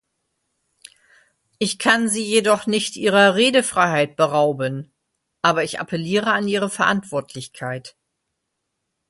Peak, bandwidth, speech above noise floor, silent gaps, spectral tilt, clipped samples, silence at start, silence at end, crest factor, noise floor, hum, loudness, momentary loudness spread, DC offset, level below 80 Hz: 0 dBFS; 12 kHz; 58 dB; none; -3.5 dB/octave; under 0.1%; 1.6 s; 1.2 s; 20 dB; -77 dBFS; none; -19 LUFS; 14 LU; under 0.1%; -64 dBFS